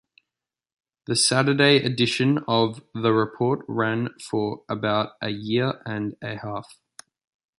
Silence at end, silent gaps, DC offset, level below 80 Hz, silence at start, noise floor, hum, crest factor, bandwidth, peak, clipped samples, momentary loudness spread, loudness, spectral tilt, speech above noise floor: 0.95 s; none; under 0.1%; -64 dBFS; 1.1 s; -88 dBFS; none; 20 dB; 11.5 kHz; -4 dBFS; under 0.1%; 13 LU; -23 LUFS; -4.5 dB/octave; 65 dB